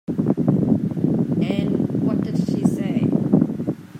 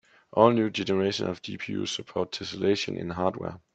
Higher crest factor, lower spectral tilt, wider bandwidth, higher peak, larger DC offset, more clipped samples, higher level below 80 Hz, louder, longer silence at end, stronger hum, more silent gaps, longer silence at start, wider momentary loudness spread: second, 16 dB vs 24 dB; first, -9 dB/octave vs -5.5 dB/octave; first, 12 kHz vs 8.8 kHz; about the same, -4 dBFS vs -4 dBFS; neither; neither; first, -54 dBFS vs -66 dBFS; first, -21 LUFS vs -27 LUFS; second, 0 s vs 0.15 s; neither; neither; second, 0.1 s vs 0.35 s; second, 4 LU vs 11 LU